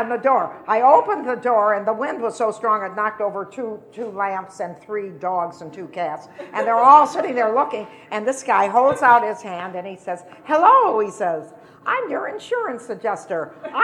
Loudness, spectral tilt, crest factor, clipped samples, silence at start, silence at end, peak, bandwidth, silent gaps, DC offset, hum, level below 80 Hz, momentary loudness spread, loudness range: -19 LUFS; -4.5 dB/octave; 18 dB; under 0.1%; 0 s; 0 s; 0 dBFS; 11.5 kHz; none; under 0.1%; none; -72 dBFS; 17 LU; 9 LU